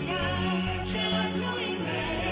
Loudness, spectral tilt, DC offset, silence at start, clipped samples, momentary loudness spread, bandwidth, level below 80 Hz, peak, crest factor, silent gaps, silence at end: -29 LUFS; -10 dB/octave; under 0.1%; 0 s; under 0.1%; 3 LU; 5.2 kHz; -44 dBFS; -16 dBFS; 12 dB; none; 0 s